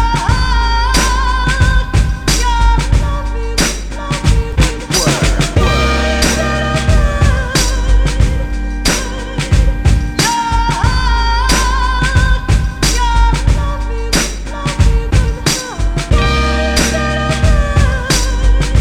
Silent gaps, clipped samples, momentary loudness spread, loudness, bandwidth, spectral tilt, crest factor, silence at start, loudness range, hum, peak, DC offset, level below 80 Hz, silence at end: none; under 0.1%; 4 LU; -14 LUFS; 14 kHz; -4 dB/octave; 12 dB; 0 s; 2 LU; none; 0 dBFS; 0.9%; -14 dBFS; 0 s